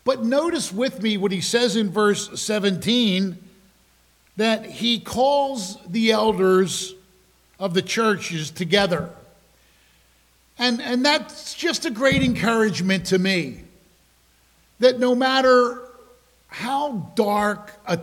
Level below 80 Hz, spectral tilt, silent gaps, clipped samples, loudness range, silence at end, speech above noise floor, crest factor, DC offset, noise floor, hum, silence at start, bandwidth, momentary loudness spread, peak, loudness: -54 dBFS; -4 dB/octave; none; under 0.1%; 3 LU; 0 s; 38 dB; 20 dB; under 0.1%; -59 dBFS; none; 0.05 s; 16.5 kHz; 10 LU; -4 dBFS; -21 LUFS